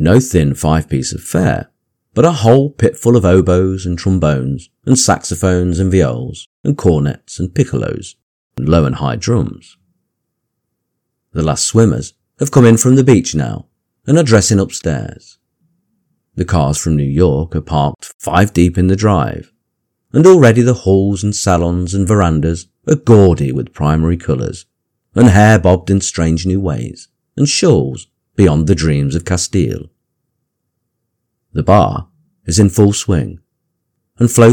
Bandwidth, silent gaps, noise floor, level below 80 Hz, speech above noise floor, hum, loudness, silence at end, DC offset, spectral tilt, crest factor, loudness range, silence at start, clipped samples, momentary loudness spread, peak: 18.5 kHz; 6.46-6.64 s, 8.23-8.50 s, 18.14-18.19 s; -73 dBFS; -32 dBFS; 61 dB; none; -13 LUFS; 0 s; under 0.1%; -6 dB/octave; 12 dB; 6 LU; 0 s; 0.8%; 14 LU; 0 dBFS